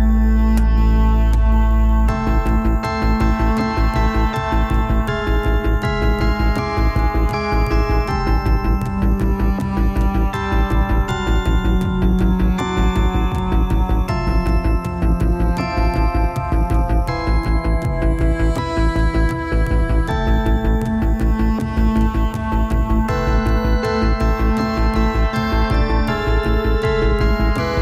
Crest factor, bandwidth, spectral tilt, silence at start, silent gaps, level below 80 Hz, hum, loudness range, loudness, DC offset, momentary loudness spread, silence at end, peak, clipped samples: 10 dB; 7.6 kHz; -7.5 dB/octave; 0 s; none; -18 dBFS; none; 1 LU; -18 LUFS; under 0.1%; 3 LU; 0 s; -6 dBFS; under 0.1%